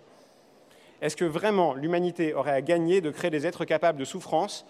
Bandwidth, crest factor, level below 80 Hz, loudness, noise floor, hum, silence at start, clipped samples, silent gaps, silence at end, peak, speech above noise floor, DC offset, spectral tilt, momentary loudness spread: 13.5 kHz; 16 dB; -74 dBFS; -27 LUFS; -57 dBFS; none; 1 s; under 0.1%; none; 0.1 s; -10 dBFS; 31 dB; under 0.1%; -5.5 dB/octave; 5 LU